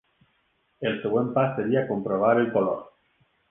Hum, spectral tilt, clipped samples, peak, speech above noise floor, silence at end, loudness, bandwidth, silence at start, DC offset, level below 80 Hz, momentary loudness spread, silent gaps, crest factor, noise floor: none; -10 dB/octave; under 0.1%; -8 dBFS; 46 dB; 0.6 s; -25 LUFS; 3.8 kHz; 0.8 s; under 0.1%; -66 dBFS; 8 LU; none; 18 dB; -70 dBFS